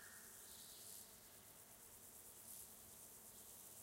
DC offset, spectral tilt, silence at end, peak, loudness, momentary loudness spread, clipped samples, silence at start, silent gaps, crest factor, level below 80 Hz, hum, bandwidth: under 0.1%; -1 dB/octave; 0 s; -44 dBFS; -57 LUFS; 5 LU; under 0.1%; 0 s; none; 18 dB; -82 dBFS; none; 16 kHz